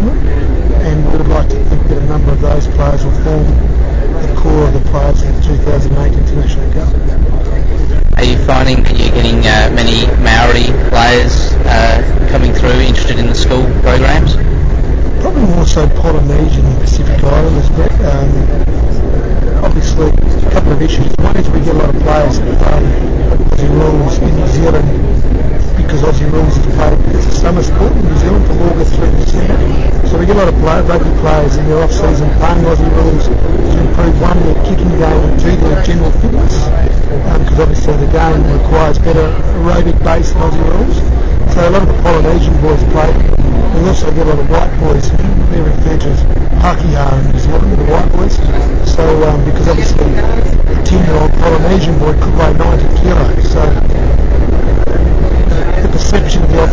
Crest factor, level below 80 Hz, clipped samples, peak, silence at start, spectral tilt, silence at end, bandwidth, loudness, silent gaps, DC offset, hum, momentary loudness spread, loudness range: 6 dB; -10 dBFS; under 0.1%; 0 dBFS; 0 s; -6.5 dB/octave; 0 s; 7.6 kHz; -11 LUFS; none; 5%; none; 4 LU; 2 LU